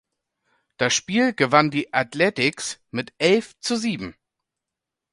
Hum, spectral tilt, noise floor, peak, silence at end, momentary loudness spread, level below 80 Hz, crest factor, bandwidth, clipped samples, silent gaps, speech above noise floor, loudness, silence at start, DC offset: none; -3.5 dB/octave; -86 dBFS; 0 dBFS; 1 s; 13 LU; -62 dBFS; 22 dB; 11.5 kHz; under 0.1%; none; 64 dB; -22 LUFS; 0.8 s; under 0.1%